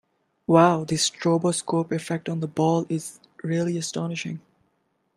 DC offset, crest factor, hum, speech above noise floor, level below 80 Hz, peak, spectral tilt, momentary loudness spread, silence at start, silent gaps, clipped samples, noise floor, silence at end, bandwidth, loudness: under 0.1%; 22 dB; none; 48 dB; -66 dBFS; -4 dBFS; -5 dB/octave; 16 LU; 0.5 s; none; under 0.1%; -71 dBFS; 0.75 s; 13 kHz; -24 LUFS